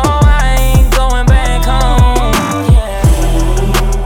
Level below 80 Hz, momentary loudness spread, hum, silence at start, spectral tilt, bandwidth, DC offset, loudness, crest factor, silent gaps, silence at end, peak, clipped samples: -10 dBFS; 3 LU; none; 0 s; -5.5 dB/octave; 17.5 kHz; under 0.1%; -11 LUFS; 8 dB; none; 0 s; 0 dBFS; under 0.1%